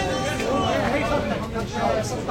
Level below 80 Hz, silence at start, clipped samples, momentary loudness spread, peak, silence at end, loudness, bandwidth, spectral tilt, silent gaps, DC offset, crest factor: -38 dBFS; 0 s; under 0.1%; 5 LU; -10 dBFS; 0 s; -24 LUFS; 16 kHz; -5 dB/octave; none; under 0.1%; 14 dB